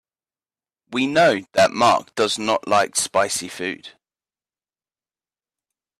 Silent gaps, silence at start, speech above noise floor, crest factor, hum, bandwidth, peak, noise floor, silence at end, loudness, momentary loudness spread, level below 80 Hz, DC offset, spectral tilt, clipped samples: none; 0.9 s; over 70 dB; 18 dB; none; 14 kHz; -4 dBFS; under -90 dBFS; 2.1 s; -19 LUFS; 12 LU; -62 dBFS; under 0.1%; -2.5 dB/octave; under 0.1%